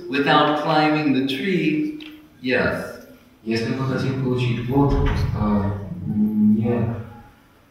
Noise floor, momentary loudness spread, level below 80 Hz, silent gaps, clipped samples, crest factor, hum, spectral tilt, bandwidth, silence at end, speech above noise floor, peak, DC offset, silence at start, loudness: -49 dBFS; 13 LU; -36 dBFS; none; under 0.1%; 18 dB; none; -7.5 dB/octave; 14 kHz; 0.5 s; 29 dB; -2 dBFS; under 0.1%; 0 s; -21 LUFS